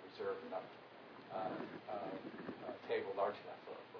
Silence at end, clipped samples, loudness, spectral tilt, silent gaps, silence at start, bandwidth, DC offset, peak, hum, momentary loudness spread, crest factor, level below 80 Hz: 0 s; under 0.1%; -45 LUFS; -3.5 dB/octave; none; 0 s; 5.4 kHz; under 0.1%; -26 dBFS; none; 13 LU; 20 dB; -86 dBFS